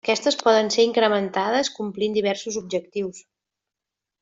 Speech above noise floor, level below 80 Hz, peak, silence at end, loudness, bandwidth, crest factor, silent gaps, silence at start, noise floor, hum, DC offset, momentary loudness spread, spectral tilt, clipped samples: 64 dB; -68 dBFS; -4 dBFS; 1 s; -22 LUFS; 7.8 kHz; 18 dB; none; 0.05 s; -86 dBFS; none; under 0.1%; 10 LU; -3.5 dB/octave; under 0.1%